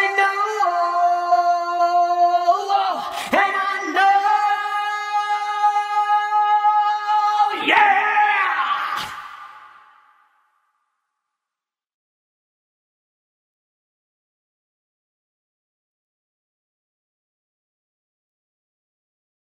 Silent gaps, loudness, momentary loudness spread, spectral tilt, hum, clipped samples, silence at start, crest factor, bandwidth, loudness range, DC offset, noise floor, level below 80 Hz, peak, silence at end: none; -18 LUFS; 7 LU; -1.5 dB/octave; none; under 0.1%; 0 s; 20 dB; 15 kHz; 6 LU; under 0.1%; -88 dBFS; -72 dBFS; -2 dBFS; 9.8 s